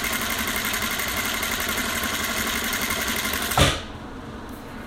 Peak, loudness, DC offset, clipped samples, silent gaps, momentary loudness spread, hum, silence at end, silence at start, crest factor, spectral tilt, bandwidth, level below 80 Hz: -4 dBFS; -23 LUFS; under 0.1%; under 0.1%; none; 17 LU; none; 0 s; 0 s; 22 dB; -2.5 dB/octave; 16.5 kHz; -38 dBFS